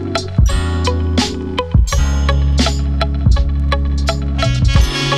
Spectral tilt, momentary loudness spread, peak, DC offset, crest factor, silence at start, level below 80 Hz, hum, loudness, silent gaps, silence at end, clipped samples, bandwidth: -5.5 dB/octave; 4 LU; 0 dBFS; under 0.1%; 14 dB; 0 s; -16 dBFS; none; -16 LUFS; none; 0 s; under 0.1%; 12 kHz